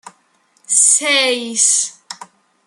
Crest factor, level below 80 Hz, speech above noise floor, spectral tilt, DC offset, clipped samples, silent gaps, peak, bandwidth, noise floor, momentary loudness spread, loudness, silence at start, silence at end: 18 dB; -78 dBFS; 44 dB; 2 dB/octave; under 0.1%; under 0.1%; none; 0 dBFS; 16 kHz; -58 dBFS; 23 LU; -12 LUFS; 0.05 s; 0.45 s